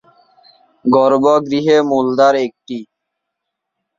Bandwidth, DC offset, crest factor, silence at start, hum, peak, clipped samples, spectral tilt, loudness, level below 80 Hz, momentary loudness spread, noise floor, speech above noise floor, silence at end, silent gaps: 7.6 kHz; under 0.1%; 14 dB; 0.85 s; none; -2 dBFS; under 0.1%; -6 dB/octave; -14 LUFS; -62 dBFS; 16 LU; -77 dBFS; 64 dB; 1.15 s; none